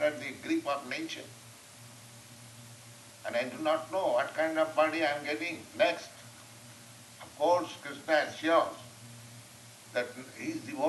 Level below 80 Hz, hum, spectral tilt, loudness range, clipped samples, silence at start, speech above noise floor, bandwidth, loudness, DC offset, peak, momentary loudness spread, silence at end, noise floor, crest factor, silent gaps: -78 dBFS; none; -3.5 dB/octave; 7 LU; under 0.1%; 0 s; 21 dB; 12 kHz; -32 LUFS; under 0.1%; -14 dBFS; 22 LU; 0 s; -52 dBFS; 20 dB; none